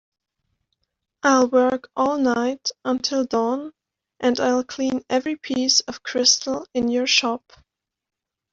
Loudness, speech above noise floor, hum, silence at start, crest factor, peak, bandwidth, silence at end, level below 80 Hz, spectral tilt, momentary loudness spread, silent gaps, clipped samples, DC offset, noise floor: -21 LUFS; 55 dB; none; 1.25 s; 20 dB; -2 dBFS; 7.8 kHz; 1.15 s; -62 dBFS; -1.5 dB/octave; 9 LU; none; under 0.1%; under 0.1%; -76 dBFS